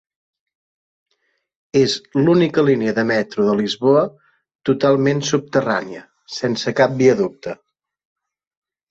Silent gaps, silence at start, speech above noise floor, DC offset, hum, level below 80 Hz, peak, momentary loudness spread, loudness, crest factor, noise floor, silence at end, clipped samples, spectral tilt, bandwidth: 4.55-4.59 s; 1.75 s; 52 dB; under 0.1%; none; -58 dBFS; -2 dBFS; 12 LU; -18 LUFS; 18 dB; -69 dBFS; 1.35 s; under 0.1%; -5.5 dB/octave; 8 kHz